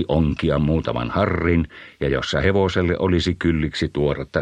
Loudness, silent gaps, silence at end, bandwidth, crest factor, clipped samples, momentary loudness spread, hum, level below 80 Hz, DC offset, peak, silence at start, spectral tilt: -21 LUFS; none; 0 s; 9.4 kHz; 16 dB; under 0.1%; 4 LU; none; -34 dBFS; under 0.1%; -4 dBFS; 0 s; -7 dB/octave